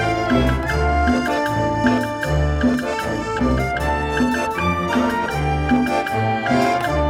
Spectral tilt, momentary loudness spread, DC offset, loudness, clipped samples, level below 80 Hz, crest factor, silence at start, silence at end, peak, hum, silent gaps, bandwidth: -6 dB/octave; 3 LU; under 0.1%; -19 LUFS; under 0.1%; -30 dBFS; 14 dB; 0 s; 0 s; -4 dBFS; none; none; 16.5 kHz